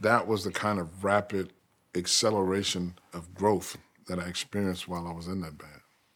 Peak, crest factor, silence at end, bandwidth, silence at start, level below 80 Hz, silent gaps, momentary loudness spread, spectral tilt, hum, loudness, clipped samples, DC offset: -8 dBFS; 22 dB; 0.35 s; 19.5 kHz; 0 s; -62 dBFS; none; 16 LU; -4 dB/octave; none; -30 LUFS; under 0.1%; under 0.1%